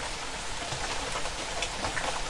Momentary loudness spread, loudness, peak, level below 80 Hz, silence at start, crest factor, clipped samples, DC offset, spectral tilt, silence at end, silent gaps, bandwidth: 4 LU; -32 LUFS; -16 dBFS; -42 dBFS; 0 s; 18 dB; under 0.1%; under 0.1%; -2 dB/octave; 0 s; none; 11.5 kHz